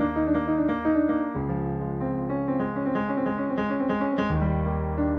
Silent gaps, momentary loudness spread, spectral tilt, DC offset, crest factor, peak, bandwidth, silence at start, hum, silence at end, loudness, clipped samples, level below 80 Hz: none; 5 LU; -10 dB/octave; under 0.1%; 12 dB; -12 dBFS; 6 kHz; 0 s; none; 0 s; -26 LUFS; under 0.1%; -38 dBFS